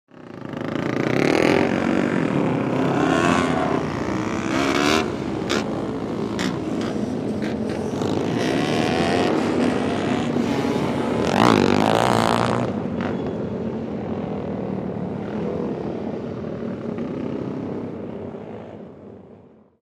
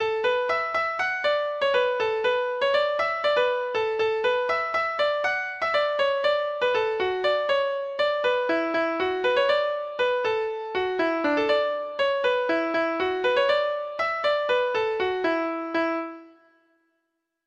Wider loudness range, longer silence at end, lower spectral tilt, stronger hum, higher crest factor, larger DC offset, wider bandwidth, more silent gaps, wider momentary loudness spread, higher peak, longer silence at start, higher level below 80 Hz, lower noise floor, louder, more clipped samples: first, 8 LU vs 1 LU; second, 0.55 s vs 1.2 s; first, -6 dB/octave vs -4 dB/octave; neither; first, 20 dB vs 14 dB; neither; first, 15.5 kHz vs 8.2 kHz; neither; first, 12 LU vs 4 LU; first, -2 dBFS vs -10 dBFS; first, 0.15 s vs 0 s; first, -48 dBFS vs -64 dBFS; second, -48 dBFS vs -78 dBFS; about the same, -22 LUFS vs -24 LUFS; neither